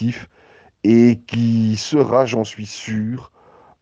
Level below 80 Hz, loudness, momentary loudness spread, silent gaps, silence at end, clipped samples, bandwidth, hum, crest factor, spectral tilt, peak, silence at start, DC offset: -58 dBFS; -17 LUFS; 14 LU; none; 0.55 s; under 0.1%; 7.8 kHz; none; 16 dB; -6.5 dB/octave; -2 dBFS; 0 s; under 0.1%